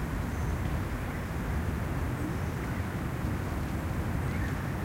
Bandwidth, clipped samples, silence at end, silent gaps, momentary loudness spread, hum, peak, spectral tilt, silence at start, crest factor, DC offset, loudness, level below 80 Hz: 16 kHz; under 0.1%; 0 s; none; 2 LU; none; -20 dBFS; -7 dB/octave; 0 s; 12 dB; under 0.1%; -33 LUFS; -38 dBFS